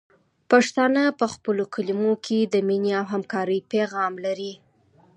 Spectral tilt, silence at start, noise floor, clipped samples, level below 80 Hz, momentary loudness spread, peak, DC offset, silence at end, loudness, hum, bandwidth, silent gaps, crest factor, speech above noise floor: -5 dB/octave; 0.5 s; -58 dBFS; under 0.1%; -70 dBFS; 8 LU; -4 dBFS; under 0.1%; 0.6 s; -23 LUFS; none; 11 kHz; none; 20 dB; 36 dB